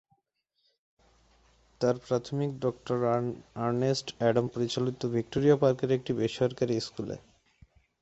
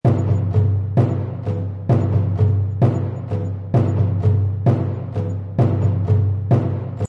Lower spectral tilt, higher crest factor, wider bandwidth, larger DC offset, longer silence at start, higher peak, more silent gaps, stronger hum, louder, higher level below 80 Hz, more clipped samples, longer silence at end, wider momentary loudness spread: second, -6.5 dB/octave vs -10.5 dB/octave; first, 20 dB vs 14 dB; first, 8.2 kHz vs 4.1 kHz; neither; first, 1.8 s vs 0.05 s; second, -10 dBFS vs -2 dBFS; neither; neither; second, -29 LUFS vs -19 LUFS; second, -62 dBFS vs -46 dBFS; neither; first, 0.85 s vs 0 s; about the same, 8 LU vs 7 LU